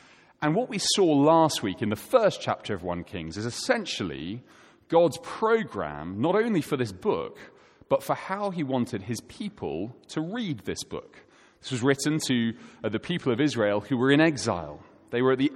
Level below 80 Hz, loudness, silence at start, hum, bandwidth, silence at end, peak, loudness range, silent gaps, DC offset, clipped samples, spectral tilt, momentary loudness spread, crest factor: -60 dBFS; -27 LUFS; 0.4 s; none; 16.5 kHz; 0 s; -6 dBFS; 7 LU; none; under 0.1%; under 0.1%; -5 dB/octave; 13 LU; 20 dB